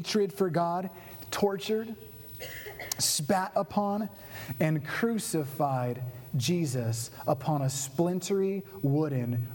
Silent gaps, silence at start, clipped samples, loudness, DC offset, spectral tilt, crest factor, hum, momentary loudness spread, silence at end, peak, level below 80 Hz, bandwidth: none; 0 s; under 0.1%; -30 LUFS; under 0.1%; -5 dB/octave; 22 dB; none; 12 LU; 0 s; -8 dBFS; -64 dBFS; over 20 kHz